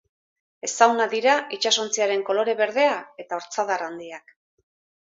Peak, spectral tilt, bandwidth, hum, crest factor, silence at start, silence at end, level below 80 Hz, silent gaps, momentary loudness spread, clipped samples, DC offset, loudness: -2 dBFS; -1 dB/octave; 8 kHz; none; 22 dB; 0.65 s; 0.85 s; -78 dBFS; none; 14 LU; under 0.1%; under 0.1%; -22 LUFS